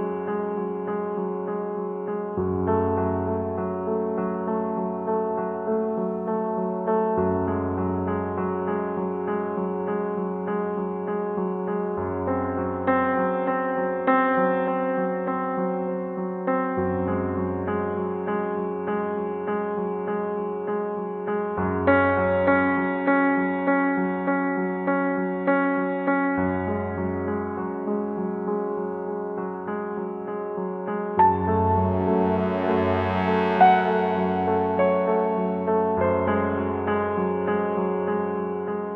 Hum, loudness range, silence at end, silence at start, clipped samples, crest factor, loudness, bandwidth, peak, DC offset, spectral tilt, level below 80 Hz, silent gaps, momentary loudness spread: none; 6 LU; 0 s; 0 s; under 0.1%; 20 dB; -25 LUFS; 4.9 kHz; -4 dBFS; under 0.1%; -10 dB/octave; -56 dBFS; none; 8 LU